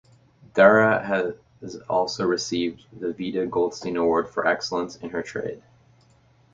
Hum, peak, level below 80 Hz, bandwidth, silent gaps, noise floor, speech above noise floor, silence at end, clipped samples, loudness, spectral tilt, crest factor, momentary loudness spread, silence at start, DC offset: none; -2 dBFS; -60 dBFS; 7.6 kHz; none; -58 dBFS; 35 dB; 0.95 s; under 0.1%; -23 LUFS; -5 dB/octave; 22 dB; 15 LU; 0.55 s; under 0.1%